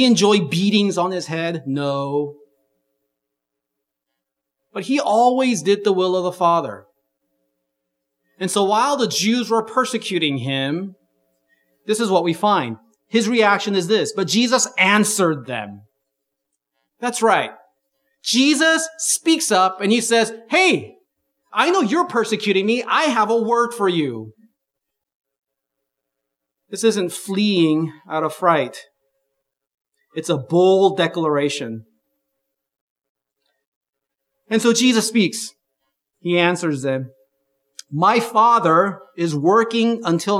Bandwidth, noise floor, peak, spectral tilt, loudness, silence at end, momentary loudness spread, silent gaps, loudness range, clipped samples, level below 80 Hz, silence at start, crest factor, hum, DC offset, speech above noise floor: 16 kHz; -81 dBFS; 0 dBFS; -4 dB/octave; -18 LUFS; 0 s; 12 LU; 25.15-25.24 s, 29.74-29.78 s, 32.81-32.96 s, 33.09-33.15 s, 33.67-33.81 s, 33.89-33.93 s; 7 LU; under 0.1%; -76 dBFS; 0 s; 20 dB; none; under 0.1%; 63 dB